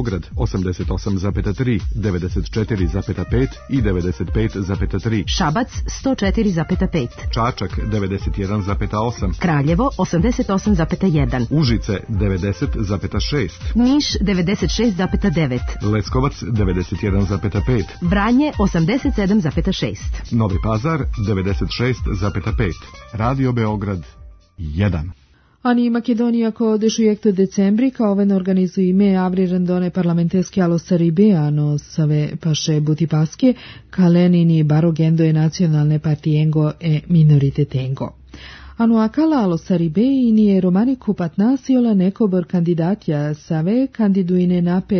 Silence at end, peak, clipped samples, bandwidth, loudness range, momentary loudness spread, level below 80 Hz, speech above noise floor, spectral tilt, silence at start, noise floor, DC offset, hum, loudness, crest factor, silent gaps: 0 s; -4 dBFS; under 0.1%; 6.6 kHz; 5 LU; 7 LU; -30 dBFS; 21 dB; -7 dB/octave; 0 s; -38 dBFS; under 0.1%; none; -18 LUFS; 14 dB; none